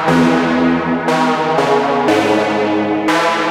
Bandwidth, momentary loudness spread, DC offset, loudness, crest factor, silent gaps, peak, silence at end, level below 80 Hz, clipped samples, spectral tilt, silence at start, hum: 14.5 kHz; 3 LU; under 0.1%; -14 LUFS; 12 dB; none; 0 dBFS; 0 s; -48 dBFS; under 0.1%; -5.5 dB/octave; 0 s; none